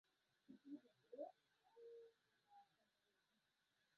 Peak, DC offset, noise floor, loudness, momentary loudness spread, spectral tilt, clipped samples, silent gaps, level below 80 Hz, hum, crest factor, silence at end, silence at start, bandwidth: -42 dBFS; under 0.1%; -87 dBFS; -62 LUFS; 9 LU; -4.5 dB/octave; under 0.1%; none; under -90 dBFS; none; 22 dB; 1.15 s; 0.5 s; 5.4 kHz